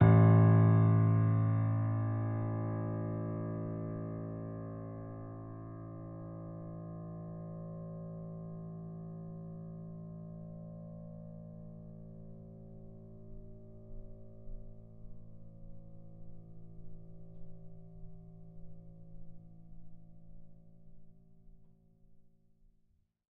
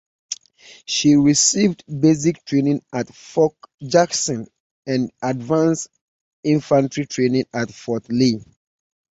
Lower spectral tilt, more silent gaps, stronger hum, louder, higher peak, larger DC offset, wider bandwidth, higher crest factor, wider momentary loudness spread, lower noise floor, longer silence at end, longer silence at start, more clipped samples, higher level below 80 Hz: first, -11 dB/octave vs -4.5 dB/octave; second, none vs 3.74-3.78 s, 4.60-4.83 s, 6.01-6.43 s; neither; second, -34 LUFS vs -19 LUFS; second, -12 dBFS vs -2 dBFS; neither; second, 2.8 kHz vs 8.4 kHz; first, 24 dB vs 18 dB; first, 27 LU vs 15 LU; first, -72 dBFS vs -47 dBFS; first, 1 s vs 0.8 s; second, 0 s vs 0.3 s; neither; about the same, -56 dBFS vs -58 dBFS